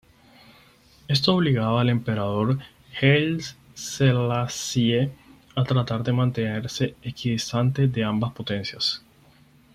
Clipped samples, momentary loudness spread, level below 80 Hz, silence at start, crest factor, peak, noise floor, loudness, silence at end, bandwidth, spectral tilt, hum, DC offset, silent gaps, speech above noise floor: under 0.1%; 9 LU; -56 dBFS; 1.1 s; 20 dB; -4 dBFS; -55 dBFS; -24 LUFS; 0.75 s; 14 kHz; -5.5 dB/octave; none; under 0.1%; none; 32 dB